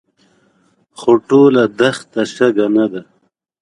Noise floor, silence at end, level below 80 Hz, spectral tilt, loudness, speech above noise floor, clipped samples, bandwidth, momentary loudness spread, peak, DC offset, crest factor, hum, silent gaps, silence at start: -62 dBFS; 0.6 s; -60 dBFS; -6 dB/octave; -14 LUFS; 49 dB; under 0.1%; 11.5 kHz; 11 LU; 0 dBFS; under 0.1%; 16 dB; none; none; 1 s